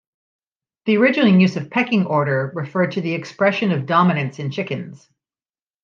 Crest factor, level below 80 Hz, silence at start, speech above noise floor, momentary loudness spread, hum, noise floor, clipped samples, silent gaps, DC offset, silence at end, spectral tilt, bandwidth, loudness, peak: 18 dB; -68 dBFS; 0.85 s; over 72 dB; 12 LU; none; under -90 dBFS; under 0.1%; none; under 0.1%; 0.85 s; -7.5 dB/octave; 7 kHz; -19 LUFS; -2 dBFS